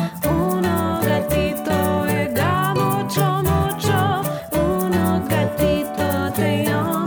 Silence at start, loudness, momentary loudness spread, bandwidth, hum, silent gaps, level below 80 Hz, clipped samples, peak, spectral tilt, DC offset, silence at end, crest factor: 0 s; -20 LUFS; 2 LU; over 20 kHz; none; none; -38 dBFS; under 0.1%; -6 dBFS; -6 dB/octave; under 0.1%; 0 s; 12 dB